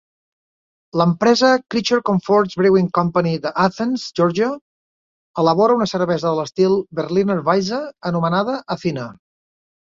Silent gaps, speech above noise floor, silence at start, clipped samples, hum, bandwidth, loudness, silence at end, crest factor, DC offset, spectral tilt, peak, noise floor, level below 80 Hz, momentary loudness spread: 4.61-5.34 s; over 73 dB; 0.95 s; under 0.1%; none; 7.6 kHz; -18 LUFS; 0.85 s; 18 dB; under 0.1%; -6 dB/octave; -2 dBFS; under -90 dBFS; -58 dBFS; 9 LU